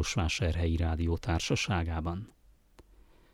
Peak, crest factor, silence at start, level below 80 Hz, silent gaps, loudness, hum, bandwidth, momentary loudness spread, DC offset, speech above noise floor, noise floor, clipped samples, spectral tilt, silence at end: -16 dBFS; 16 dB; 0 s; -40 dBFS; none; -31 LUFS; none; 12 kHz; 8 LU; under 0.1%; 29 dB; -60 dBFS; under 0.1%; -5 dB/octave; 0.5 s